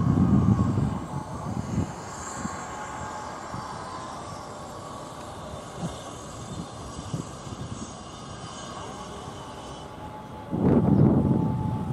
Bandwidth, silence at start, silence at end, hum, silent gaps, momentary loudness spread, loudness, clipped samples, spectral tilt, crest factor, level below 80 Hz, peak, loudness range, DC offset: 12.5 kHz; 0 s; 0 s; none; none; 18 LU; -29 LUFS; under 0.1%; -7 dB/octave; 20 dB; -44 dBFS; -8 dBFS; 11 LU; under 0.1%